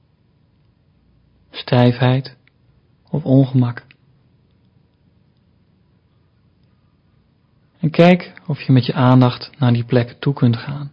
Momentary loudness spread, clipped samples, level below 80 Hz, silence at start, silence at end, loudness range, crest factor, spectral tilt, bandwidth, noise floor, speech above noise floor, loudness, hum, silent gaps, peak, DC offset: 14 LU; under 0.1%; -54 dBFS; 1.55 s; 0.05 s; 6 LU; 18 dB; -9.5 dB/octave; 5.4 kHz; -57 dBFS; 42 dB; -16 LUFS; none; none; 0 dBFS; under 0.1%